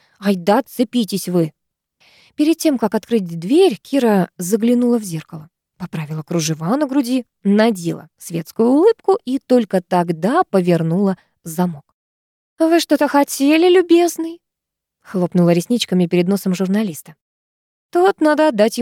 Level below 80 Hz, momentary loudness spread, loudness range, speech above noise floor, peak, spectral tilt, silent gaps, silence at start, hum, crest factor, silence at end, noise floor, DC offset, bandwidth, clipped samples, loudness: -68 dBFS; 13 LU; 3 LU; 66 dB; -2 dBFS; -6 dB/octave; 11.94-12.57 s, 17.21-17.89 s; 0.2 s; none; 14 dB; 0 s; -82 dBFS; under 0.1%; 17 kHz; under 0.1%; -17 LUFS